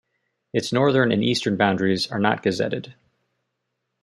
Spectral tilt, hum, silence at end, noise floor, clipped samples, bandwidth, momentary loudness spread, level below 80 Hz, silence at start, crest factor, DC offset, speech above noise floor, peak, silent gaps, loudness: -5.5 dB/octave; none; 1.1 s; -78 dBFS; under 0.1%; 12 kHz; 8 LU; -64 dBFS; 0.55 s; 20 dB; under 0.1%; 57 dB; -4 dBFS; none; -22 LUFS